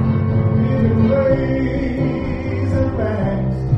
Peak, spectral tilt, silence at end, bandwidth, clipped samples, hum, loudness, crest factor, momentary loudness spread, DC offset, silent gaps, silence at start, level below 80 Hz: -4 dBFS; -10 dB/octave; 0 s; 6 kHz; under 0.1%; none; -18 LUFS; 12 dB; 6 LU; under 0.1%; none; 0 s; -30 dBFS